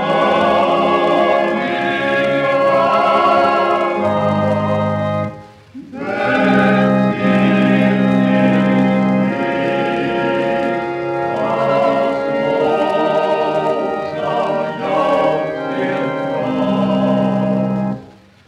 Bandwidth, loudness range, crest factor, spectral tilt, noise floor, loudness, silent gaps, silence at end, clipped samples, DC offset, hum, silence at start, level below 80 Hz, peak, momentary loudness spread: 9.6 kHz; 3 LU; 14 dB; -7.5 dB/octave; -40 dBFS; -15 LUFS; none; 0.4 s; under 0.1%; under 0.1%; none; 0 s; -52 dBFS; -2 dBFS; 7 LU